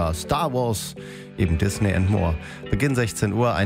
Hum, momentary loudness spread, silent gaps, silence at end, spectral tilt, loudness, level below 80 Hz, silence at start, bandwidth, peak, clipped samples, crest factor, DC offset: none; 9 LU; none; 0 s; -6 dB/octave; -23 LUFS; -38 dBFS; 0 s; 16 kHz; -6 dBFS; under 0.1%; 16 dB; under 0.1%